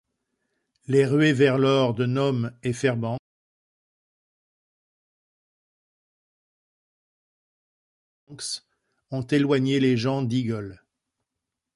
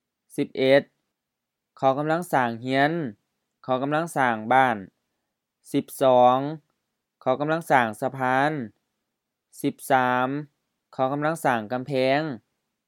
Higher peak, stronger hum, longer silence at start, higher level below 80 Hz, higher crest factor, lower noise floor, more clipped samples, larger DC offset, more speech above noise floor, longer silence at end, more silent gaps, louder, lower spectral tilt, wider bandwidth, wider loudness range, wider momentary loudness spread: second, -8 dBFS vs -4 dBFS; neither; first, 0.9 s vs 0.4 s; first, -64 dBFS vs -80 dBFS; about the same, 20 dB vs 22 dB; about the same, -85 dBFS vs -84 dBFS; neither; neither; about the same, 63 dB vs 61 dB; first, 1 s vs 0.5 s; first, 3.19-8.27 s vs none; about the same, -23 LUFS vs -24 LUFS; about the same, -6.5 dB/octave vs -5.5 dB/octave; second, 11.5 kHz vs 18 kHz; first, 18 LU vs 3 LU; about the same, 14 LU vs 13 LU